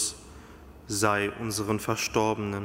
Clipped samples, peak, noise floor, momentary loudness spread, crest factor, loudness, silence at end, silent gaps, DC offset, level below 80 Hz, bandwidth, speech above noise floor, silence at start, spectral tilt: under 0.1%; -8 dBFS; -48 dBFS; 22 LU; 20 dB; -28 LUFS; 0 s; none; under 0.1%; -54 dBFS; 16 kHz; 20 dB; 0 s; -4 dB/octave